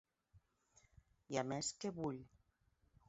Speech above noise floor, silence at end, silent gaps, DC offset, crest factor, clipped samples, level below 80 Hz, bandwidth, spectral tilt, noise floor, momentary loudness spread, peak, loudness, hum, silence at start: 35 dB; 0.8 s; none; under 0.1%; 24 dB; under 0.1%; -74 dBFS; 7.6 kHz; -5 dB/octave; -78 dBFS; 5 LU; -24 dBFS; -44 LUFS; none; 0.35 s